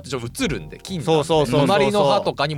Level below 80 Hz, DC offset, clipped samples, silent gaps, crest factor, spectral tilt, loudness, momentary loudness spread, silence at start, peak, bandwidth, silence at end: -44 dBFS; under 0.1%; under 0.1%; none; 14 dB; -5.5 dB/octave; -19 LUFS; 12 LU; 0.05 s; -6 dBFS; 16.5 kHz; 0 s